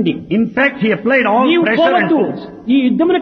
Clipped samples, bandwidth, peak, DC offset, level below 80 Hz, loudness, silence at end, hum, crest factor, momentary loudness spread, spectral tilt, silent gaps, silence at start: under 0.1%; 6.2 kHz; -2 dBFS; under 0.1%; -54 dBFS; -13 LUFS; 0 s; none; 12 dB; 5 LU; -8 dB/octave; none; 0 s